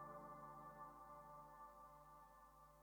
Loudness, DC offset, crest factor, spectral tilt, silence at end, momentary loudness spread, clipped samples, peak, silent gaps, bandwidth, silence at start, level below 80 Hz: -61 LUFS; under 0.1%; 16 dB; -6 dB/octave; 0 s; 8 LU; under 0.1%; -46 dBFS; none; over 20 kHz; 0 s; -76 dBFS